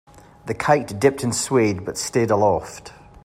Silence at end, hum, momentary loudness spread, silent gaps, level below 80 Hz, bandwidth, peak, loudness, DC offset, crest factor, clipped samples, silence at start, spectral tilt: 0.35 s; none; 16 LU; none; -52 dBFS; 16 kHz; -2 dBFS; -20 LUFS; under 0.1%; 18 dB; under 0.1%; 0.45 s; -5 dB/octave